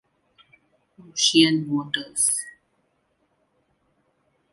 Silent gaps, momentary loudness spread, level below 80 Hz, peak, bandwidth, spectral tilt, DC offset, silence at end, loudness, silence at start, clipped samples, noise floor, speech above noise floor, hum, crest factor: none; 13 LU; -70 dBFS; -4 dBFS; 11.5 kHz; -2.5 dB/octave; under 0.1%; 2.05 s; -21 LUFS; 1.15 s; under 0.1%; -70 dBFS; 48 dB; none; 22 dB